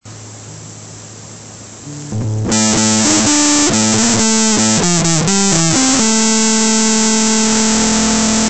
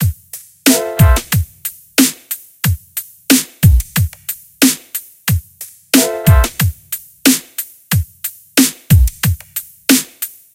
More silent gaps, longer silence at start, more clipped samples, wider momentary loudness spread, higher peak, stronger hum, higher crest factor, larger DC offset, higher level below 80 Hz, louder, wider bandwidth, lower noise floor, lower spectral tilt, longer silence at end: neither; about the same, 0 s vs 0 s; second, under 0.1% vs 0.1%; first, 21 LU vs 14 LU; about the same, 0 dBFS vs 0 dBFS; neither; about the same, 14 dB vs 14 dB; first, 2% vs under 0.1%; second, -38 dBFS vs -22 dBFS; first, -11 LUFS vs -14 LUFS; second, 9.4 kHz vs over 20 kHz; about the same, -33 dBFS vs -36 dBFS; second, -2.5 dB/octave vs -4 dB/octave; second, 0 s vs 0.25 s